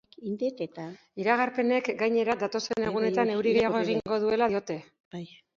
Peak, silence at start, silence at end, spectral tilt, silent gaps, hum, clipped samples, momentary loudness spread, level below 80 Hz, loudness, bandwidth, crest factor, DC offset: -10 dBFS; 0.2 s; 0.3 s; -5.5 dB/octave; 5.00-5.11 s; none; under 0.1%; 16 LU; -66 dBFS; -27 LUFS; 7.4 kHz; 18 dB; under 0.1%